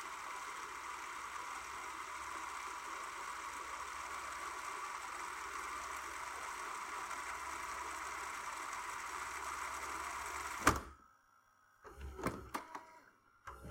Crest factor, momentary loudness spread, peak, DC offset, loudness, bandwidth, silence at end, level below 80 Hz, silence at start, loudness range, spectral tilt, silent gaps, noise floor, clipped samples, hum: 32 dB; 6 LU; -12 dBFS; under 0.1%; -43 LUFS; 16.5 kHz; 0 s; -62 dBFS; 0 s; 4 LU; -2.5 dB/octave; none; -70 dBFS; under 0.1%; none